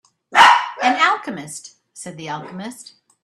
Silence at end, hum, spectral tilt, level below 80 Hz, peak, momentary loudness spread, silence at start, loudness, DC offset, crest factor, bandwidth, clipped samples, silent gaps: 0.4 s; none; -2 dB/octave; -68 dBFS; 0 dBFS; 23 LU; 0.3 s; -14 LUFS; under 0.1%; 18 dB; 14 kHz; under 0.1%; none